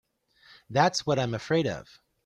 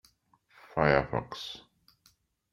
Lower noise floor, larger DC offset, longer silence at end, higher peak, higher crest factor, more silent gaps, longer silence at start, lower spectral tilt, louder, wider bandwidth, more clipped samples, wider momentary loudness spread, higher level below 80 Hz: second, -59 dBFS vs -68 dBFS; neither; second, 0.4 s vs 0.95 s; about the same, -8 dBFS vs -6 dBFS; about the same, 22 dB vs 26 dB; neither; about the same, 0.7 s vs 0.75 s; second, -5 dB/octave vs -6.5 dB/octave; first, -27 LUFS vs -30 LUFS; second, 13 kHz vs 15.5 kHz; neither; second, 8 LU vs 16 LU; second, -62 dBFS vs -54 dBFS